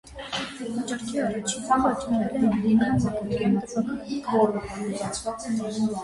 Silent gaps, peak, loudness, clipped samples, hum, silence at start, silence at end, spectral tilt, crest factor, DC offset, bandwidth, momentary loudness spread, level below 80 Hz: none; -10 dBFS; -26 LUFS; under 0.1%; none; 0.05 s; 0 s; -5.5 dB/octave; 16 dB; under 0.1%; 11.5 kHz; 9 LU; -50 dBFS